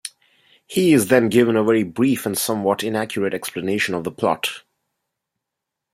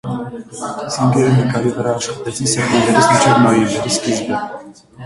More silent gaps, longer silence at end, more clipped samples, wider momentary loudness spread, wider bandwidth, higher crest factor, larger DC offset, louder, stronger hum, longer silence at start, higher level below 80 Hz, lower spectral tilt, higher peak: neither; first, 1.35 s vs 0 s; neither; second, 10 LU vs 15 LU; first, 16 kHz vs 11.5 kHz; about the same, 18 dB vs 16 dB; neither; second, -19 LUFS vs -15 LUFS; neither; about the same, 0.05 s vs 0.05 s; second, -62 dBFS vs -48 dBFS; about the same, -4.5 dB/octave vs -5 dB/octave; about the same, -2 dBFS vs 0 dBFS